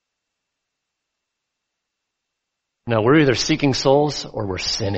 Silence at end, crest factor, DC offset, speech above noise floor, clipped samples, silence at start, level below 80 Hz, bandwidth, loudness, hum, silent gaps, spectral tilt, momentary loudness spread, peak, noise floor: 0 s; 20 dB; under 0.1%; 62 dB; under 0.1%; 2.85 s; -48 dBFS; 8.2 kHz; -18 LUFS; none; none; -5 dB/octave; 11 LU; -2 dBFS; -80 dBFS